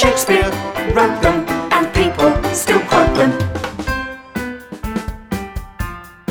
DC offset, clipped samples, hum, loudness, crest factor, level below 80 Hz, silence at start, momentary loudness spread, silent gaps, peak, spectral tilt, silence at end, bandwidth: under 0.1%; under 0.1%; none; -16 LUFS; 16 dB; -30 dBFS; 0 s; 14 LU; none; 0 dBFS; -4.5 dB/octave; 0.2 s; over 20 kHz